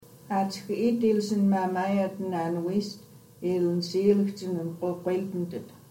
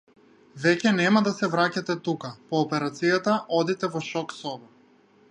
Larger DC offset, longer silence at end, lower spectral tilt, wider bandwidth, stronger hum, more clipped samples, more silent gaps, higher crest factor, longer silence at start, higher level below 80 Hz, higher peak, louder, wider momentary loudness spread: neither; second, 0.15 s vs 0.65 s; first, -7 dB/octave vs -5.5 dB/octave; first, 16.5 kHz vs 11 kHz; neither; neither; neither; about the same, 16 dB vs 20 dB; second, 0.1 s vs 0.55 s; about the same, -72 dBFS vs -74 dBFS; second, -10 dBFS vs -6 dBFS; second, -28 LUFS vs -25 LUFS; about the same, 9 LU vs 11 LU